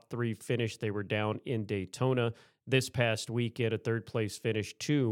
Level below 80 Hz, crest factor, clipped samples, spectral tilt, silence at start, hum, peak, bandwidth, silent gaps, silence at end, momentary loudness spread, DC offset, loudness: -72 dBFS; 20 dB; under 0.1%; -5.5 dB/octave; 0.1 s; none; -12 dBFS; 16 kHz; none; 0 s; 5 LU; under 0.1%; -33 LUFS